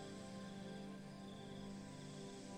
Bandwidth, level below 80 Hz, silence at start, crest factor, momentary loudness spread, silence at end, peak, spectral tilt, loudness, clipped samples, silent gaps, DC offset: 16 kHz; -72 dBFS; 0 s; 12 dB; 2 LU; 0 s; -40 dBFS; -5.5 dB/octave; -53 LUFS; under 0.1%; none; under 0.1%